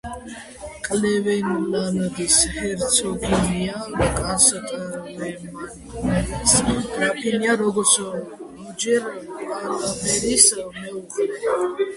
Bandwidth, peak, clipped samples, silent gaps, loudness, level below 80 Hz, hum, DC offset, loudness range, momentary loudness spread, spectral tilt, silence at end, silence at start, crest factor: 12 kHz; 0 dBFS; under 0.1%; none; -20 LUFS; -40 dBFS; none; under 0.1%; 2 LU; 18 LU; -3 dB/octave; 0 s; 0.05 s; 22 dB